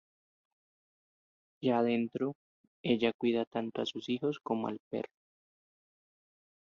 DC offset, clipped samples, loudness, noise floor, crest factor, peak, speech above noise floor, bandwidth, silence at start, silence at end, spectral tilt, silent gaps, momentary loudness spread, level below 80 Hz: under 0.1%; under 0.1%; -34 LUFS; under -90 dBFS; 20 dB; -16 dBFS; over 57 dB; 7.2 kHz; 1.6 s; 1.6 s; -6.5 dB/octave; 2.35-2.84 s, 3.14-3.19 s, 3.47-3.51 s, 4.80-4.91 s; 11 LU; -78 dBFS